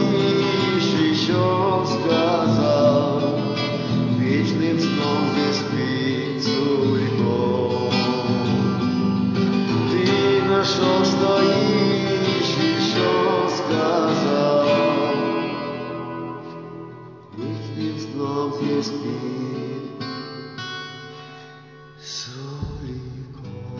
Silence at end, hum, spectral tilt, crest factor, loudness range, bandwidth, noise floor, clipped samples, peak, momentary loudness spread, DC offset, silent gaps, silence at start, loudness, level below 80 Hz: 0 s; none; -6 dB/octave; 14 dB; 10 LU; 7.6 kHz; -43 dBFS; under 0.1%; -6 dBFS; 15 LU; under 0.1%; none; 0 s; -21 LUFS; -50 dBFS